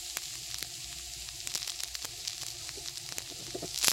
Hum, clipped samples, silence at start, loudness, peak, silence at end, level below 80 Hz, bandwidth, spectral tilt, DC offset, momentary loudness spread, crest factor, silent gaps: none; under 0.1%; 0 s; -36 LUFS; -2 dBFS; 0 s; -60 dBFS; 17 kHz; 0 dB/octave; under 0.1%; 5 LU; 36 dB; none